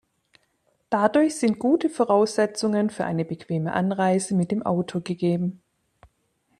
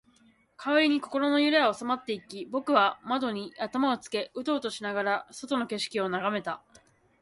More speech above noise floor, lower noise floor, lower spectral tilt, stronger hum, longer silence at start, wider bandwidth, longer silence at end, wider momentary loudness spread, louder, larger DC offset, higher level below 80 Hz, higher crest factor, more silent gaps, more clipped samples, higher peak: first, 47 dB vs 35 dB; first, -69 dBFS vs -63 dBFS; first, -6 dB/octave vs -4 dB/octave; neither; first, 0.9 s vs 0.6 s; about the same, 12.5 kHz vs 11.5 kHz; first, 1.05 s vs 0.65 s; second, 8 LU vs 11 LU; first, -23 LUFS vs -28 LUFS; neither; first, -66 dBFS vs -74 dBFS; about the same, 20 dB vs 22 dB; neither; neither; first, -4 dBFS vs -8 dBFS